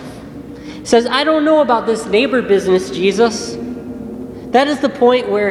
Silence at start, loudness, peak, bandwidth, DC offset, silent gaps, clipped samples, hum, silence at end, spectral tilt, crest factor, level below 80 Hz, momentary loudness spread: 0 s; -14 LUFS; 0 dBFS; 12.5 kHz; under 0.1%; none; under 0.1%; none; 0 s; -4.5 dB/octave; 16 dB; -48 dBFS; 16 LU